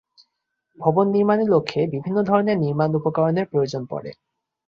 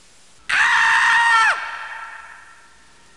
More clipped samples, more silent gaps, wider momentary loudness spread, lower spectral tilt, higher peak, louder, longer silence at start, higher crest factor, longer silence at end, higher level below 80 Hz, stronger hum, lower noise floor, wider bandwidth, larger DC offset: neither; neither; second, 9 LU vs 20 LU; first, -8 dB/octave vs 1.5 dB/octave; about the same, -4 dBFS vs -6 dBFS; second, -21 LUFS vs -15 LUFS; first, 0.8 s vs 0.5 s; about the same, 18 dB vs 14 dB; second, 0.55 s vs 0.8 s; about the same, -62 dBFS vs -60 dBFS; neither; first, -77 dBFS vs -51 dBFS; second, 7.4 kHz vs 11.5 kHz; second, under 0.1% vs 0.3%